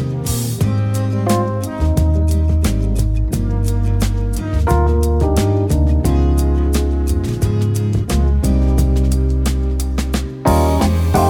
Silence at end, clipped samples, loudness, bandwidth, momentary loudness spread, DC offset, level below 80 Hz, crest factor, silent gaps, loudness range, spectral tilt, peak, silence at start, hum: 0 s; under 0.1%; -17 LUFS; 17.5 kHz; 5 LU; under 0.1%; -18 dBFS; 14 dB; none; 1 LU; -7 dB/octave; 0 dBFS; 0 s; none